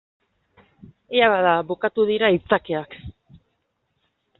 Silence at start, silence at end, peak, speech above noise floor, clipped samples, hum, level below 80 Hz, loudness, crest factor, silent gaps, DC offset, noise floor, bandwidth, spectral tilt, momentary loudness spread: 1.1 s; 1.3 s; -2 dBFS; 53 dB; under 0.1%; none; -56 dBFS; -20 LUFS; 20 dB; none; under 0.1%; -73 dBFS; 4.3 kHz; -2.5 dB/octave; 12 LU